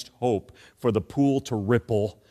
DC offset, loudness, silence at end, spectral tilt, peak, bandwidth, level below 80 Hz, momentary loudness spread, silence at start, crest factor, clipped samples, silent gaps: under 0.1%; -26 LUFS; 0.2 s; -7.5 dB/octave; -8 dBFS; 13.5 kHz; -56 dBFS; 4 LU; 0 s; 18 dB; under 0.1%; none